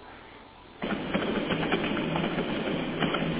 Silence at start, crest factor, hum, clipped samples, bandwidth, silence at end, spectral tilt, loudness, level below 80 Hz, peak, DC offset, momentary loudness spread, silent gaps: 0 s; 18 dB; none; under 0.1%; 4 kHz; 0 s; -4 dB/octave; -29 LUFS; -52 dBFS; -12 dBFS; under 0.1%; 19 LU; none